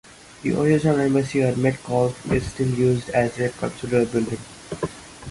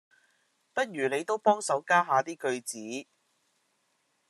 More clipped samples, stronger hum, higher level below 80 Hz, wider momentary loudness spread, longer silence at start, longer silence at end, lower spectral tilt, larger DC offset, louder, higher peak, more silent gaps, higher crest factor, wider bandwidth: neither; neither; first, -46 dBFS vs -86 dBFS; about the same, 12 LU vs 13 LU; second, 0.3 s vs 0.75 s; second, 0 s vs 1.25 s; first, -7 dB/octave vs -3.5 dB/octave; neither; first, -22 LUFS vs -29 LUFS; first, -6 dBFS vs -10 dBFS; neither; second, 16 dB vs 22 dB; second, 11.5 kHz vs 13 kHz